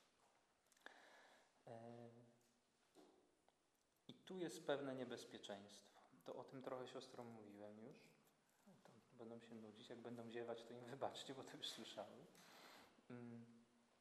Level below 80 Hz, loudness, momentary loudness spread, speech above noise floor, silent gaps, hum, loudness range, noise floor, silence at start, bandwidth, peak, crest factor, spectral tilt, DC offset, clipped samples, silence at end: under -90 dBFS; -56 LUFS; 15 LU; 30 dB; none; none; 13 LU; -84 dBFS; 0 s; 13 kHz; -30 dBFS; 26 dB; -4.5 dB/octave; under 0.1%; under 0.1%; 0 s